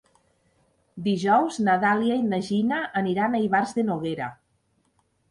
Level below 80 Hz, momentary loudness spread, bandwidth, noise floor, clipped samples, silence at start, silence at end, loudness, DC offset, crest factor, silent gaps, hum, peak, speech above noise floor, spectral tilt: -66 dBFS; 8 LU; 11 kHz; -69 dBFS; under 0.1%; 0.95 s; 0.95 s; -24 LUFS; under 0.1%; 18 dB; none; none; -8 dBFS; 45 dB; -6 dB/octave